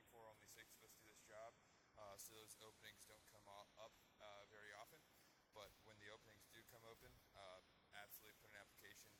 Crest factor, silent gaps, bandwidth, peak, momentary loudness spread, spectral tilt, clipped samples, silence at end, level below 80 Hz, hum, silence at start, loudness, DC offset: 22 dB; none; 18 kHz; -44 dBFS; 7 LU; -2 dB/octave; under 0.1%; 0 s; -86 dBFS; none; 0 s; -64 LUFS; under 0.1%